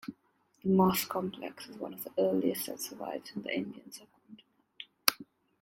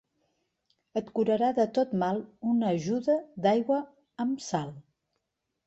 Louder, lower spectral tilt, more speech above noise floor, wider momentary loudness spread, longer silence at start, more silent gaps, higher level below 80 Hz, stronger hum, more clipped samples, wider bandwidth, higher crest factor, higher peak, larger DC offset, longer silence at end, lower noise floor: second, -33 LUFS vs -29 LUFS; second, -4.5 dB/octave vs -6.5 dB/octave; second, 38 dB vs 54 dB; first, 22 LU vs 9 LU; second, 0.05 s vs 0.95 s; neither; about the same, -70 dBFS vs -72 dBFS; neither; neither; first, 16.5 kHz vs 8.2 kHz; first, 30 dB vs 18 dB; first, -4 dBFS vs -12 dBFS; neither; second, 0.4 s vs 0.85 s; second, -71 dBFS vs -82 dBFS